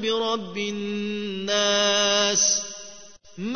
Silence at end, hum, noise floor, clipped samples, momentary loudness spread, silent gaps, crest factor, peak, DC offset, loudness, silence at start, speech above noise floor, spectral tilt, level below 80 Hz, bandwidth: 0 s; none; -47 dBFS; under 0.1%; 16 LU; none; 18 dB; -6 dBFS; 0.3%; -22 LUFS; 0 s; 23 dB; -1.5 dB/octave; -66 dBFS; 6.6 kHz